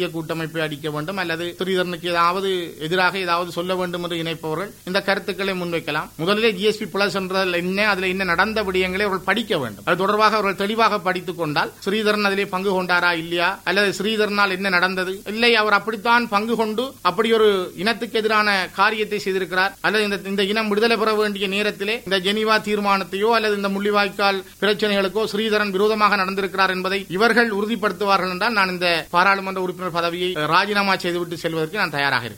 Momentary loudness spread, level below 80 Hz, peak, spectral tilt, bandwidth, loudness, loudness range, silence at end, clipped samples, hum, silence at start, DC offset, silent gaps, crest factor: 7 LU; -54 dBFS; -2 dBFS; -4.5 dB/octave; 16.5 kHz; -20 LUFS; 3 LU; 0 s; under 0.1%; none; 0 s; under 0.1%; none; 18 dB